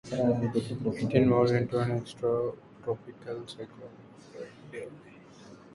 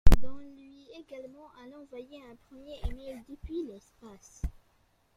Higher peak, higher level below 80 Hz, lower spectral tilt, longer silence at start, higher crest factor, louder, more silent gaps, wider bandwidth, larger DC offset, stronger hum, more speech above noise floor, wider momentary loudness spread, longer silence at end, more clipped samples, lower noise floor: second, -10 dBFS vs -4 dBFS; second, -60 dBFS vs -34 dBFS; first, -8 dB/octave vs -6.5 dB/octave; about the same, 0.05 s vs 0.05 s; about the same, 20 dB vs 22 dB; first, -29 LUFS vs -40 LUFS; neither; second, 11.5 kHz vs 14.5 kHz; neither; neither; second, 22 dB vs 27 dB; first, 21 LU vs 13 LU; second, 0.05 s vs 0.65 s; neither; second, -51 dBFS vs -69 dBFS